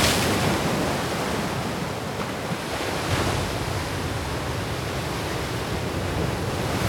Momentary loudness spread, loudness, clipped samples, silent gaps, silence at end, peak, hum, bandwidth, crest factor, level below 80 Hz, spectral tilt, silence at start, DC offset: 6 LU; -26 LUFS; under 0.1%; none; 0 s; -6 dBFS; none; over 20 kHz; 20 dB; -40 dBFS; -4.5 dB/octave; 0 s; under 0.1%